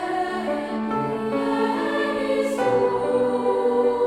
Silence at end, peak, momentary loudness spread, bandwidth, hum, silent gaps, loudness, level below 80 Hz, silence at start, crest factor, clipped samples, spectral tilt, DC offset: 0 s; -10 dBFS; 5 LU; 13 kHz; none; none; -23 LUFS; -56 dBFS; 0 s; 12 dB; under 0.1%; -6 dB/octave; under 0.1%